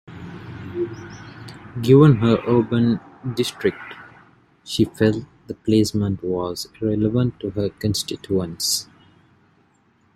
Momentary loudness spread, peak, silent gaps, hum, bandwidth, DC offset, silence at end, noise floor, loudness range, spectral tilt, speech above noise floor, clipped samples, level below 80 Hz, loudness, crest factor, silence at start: 21 LU; -2 dBFS; none; none; 14.5 kHz; under 0.1%; 1.35 s; -60 dBFS; 5 LU; -6 dB/octave; 40 dB; under 0.1%; -52 dBFS; -21 LUFS; 20 dB; 0.1 s